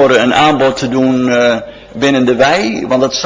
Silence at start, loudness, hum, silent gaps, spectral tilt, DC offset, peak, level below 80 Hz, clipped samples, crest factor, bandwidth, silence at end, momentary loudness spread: 0 s; -11 LUFS; none; none; -4.5 dB/octave; under 0.1%; 0 dBFS; -44 dBFS; under 0.1%; 10 dB; 8 kHz; 0 s; 6 LU